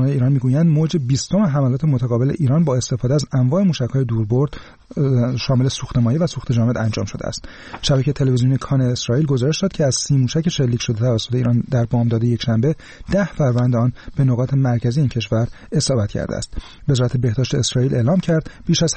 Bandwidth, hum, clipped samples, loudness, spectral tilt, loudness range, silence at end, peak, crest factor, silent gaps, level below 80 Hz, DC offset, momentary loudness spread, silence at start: 8.8 kHz; none; under 0.1%; -18 LUFS; -6 dB/octave; 2 LU; 0 s; -6 dBFS; 10 dB; none; -40 dBFS; 0.2%; 5 LU; 0 s